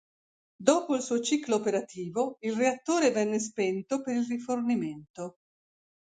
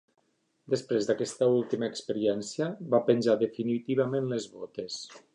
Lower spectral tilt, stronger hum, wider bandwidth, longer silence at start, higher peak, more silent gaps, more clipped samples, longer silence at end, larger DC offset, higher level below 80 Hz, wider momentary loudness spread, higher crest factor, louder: second, -4 dB/octave vs -5.5 dB/octave; neither; second, 9.6 kHz vs 11 kHz; about the same, 0.6 s vs 0.7 s; about the same, -8 dBFS vs -10 dBFS; first, 5.10-5.14 s vs none; neither; first, 0.75 s vs 0.15 s; neither; about the same, -76 dBFS vs -76 dBFS; about the same, 10 LU vs 12 LU; about the same, 22 dB vs 20 dB; about the same, -29 LUFS vs -29 LUFS